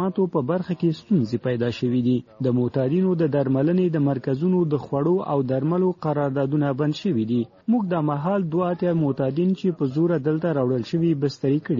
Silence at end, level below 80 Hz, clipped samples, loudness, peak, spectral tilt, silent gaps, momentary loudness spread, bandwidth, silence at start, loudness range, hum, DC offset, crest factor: 0 s; -60 dBFS; under 0.1%; -23 LUFS; -8 dBFS; -8 dB/octave; none; 3 LU; 7.4 kHz; 0 s; 1 LU; none; under 0.1%; 12 dB